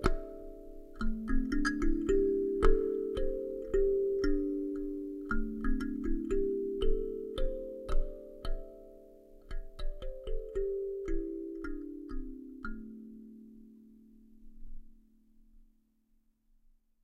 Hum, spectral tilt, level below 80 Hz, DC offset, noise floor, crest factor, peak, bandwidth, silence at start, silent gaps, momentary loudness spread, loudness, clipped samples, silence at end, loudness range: none; -7 dB/octave; -36 dBFS; under 0.1%; -71 dBFS; 20 dB; -12 dBFS; 10 kHz; 0 s; none; 20 LU; -35 LUFS; under 0.1%; 2.15 s; 16 LU